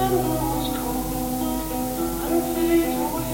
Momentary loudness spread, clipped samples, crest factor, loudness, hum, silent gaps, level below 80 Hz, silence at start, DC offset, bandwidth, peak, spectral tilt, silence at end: 5 LU; under 0.1%; 14 dB; -24 LUFS; none; none; -36 dBFS; 0 s; under 0.1%; 17 kHz; -10 dBFS; -5 dB/octave; 0 s